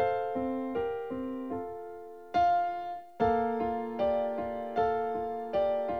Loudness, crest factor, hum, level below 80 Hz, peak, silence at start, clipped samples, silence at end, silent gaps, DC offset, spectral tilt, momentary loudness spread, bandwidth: -32 LUFS; 16 dB; none; -58 dBFS; -16 dBFS; 0 s; under 0.1%; 0 s; none; 0.2%; -7.5 dB/octave; 10 LU; 6.2 kHz